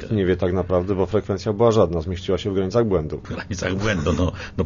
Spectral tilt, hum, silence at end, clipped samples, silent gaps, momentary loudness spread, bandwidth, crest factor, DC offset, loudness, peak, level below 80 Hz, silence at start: -6.5 dB/octave; none; 0 s; under 0.1%; none; 8 LU; 7.4 kHz; 16 dB; under 0.1%; -22 LUFS; -4 dBFS; -38 dBFS; 0 s